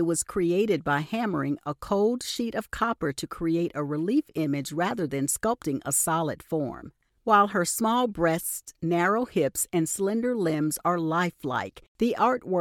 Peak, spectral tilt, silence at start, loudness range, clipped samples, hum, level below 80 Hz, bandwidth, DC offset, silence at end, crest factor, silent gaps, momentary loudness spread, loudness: -8 dBFS; -4.5 dB/octave; 0 s; 3 LU; under 0.1%; none; -56 dBFS; 18 kHz; under 0.1%; 0 s; 18 dB; 11.88-11.95 s; 7 LU; -26 LUFS